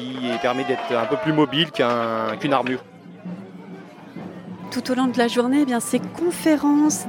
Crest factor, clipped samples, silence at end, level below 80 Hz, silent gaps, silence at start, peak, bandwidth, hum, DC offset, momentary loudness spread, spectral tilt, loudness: 18 dB; under 0.1%; 0 s; -66 dBFS; none; 0 s; -4 dBFS; 18 kHz; none; under 0.1%; 18 LU; -4.5 dB/octave; -21 LUFS